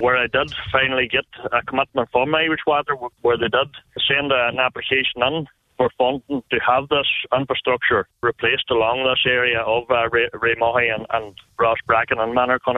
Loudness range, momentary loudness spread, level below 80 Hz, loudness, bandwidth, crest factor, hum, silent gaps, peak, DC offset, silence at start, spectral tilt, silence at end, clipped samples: 2 LU; 6 LU; -50 dBFS; -19 LUFS; 6 kHz; 18 dB; none; none; -2 dBFS; under 0.1%; 0 s; -6.5 dB/octave; 0 s; under 0.1%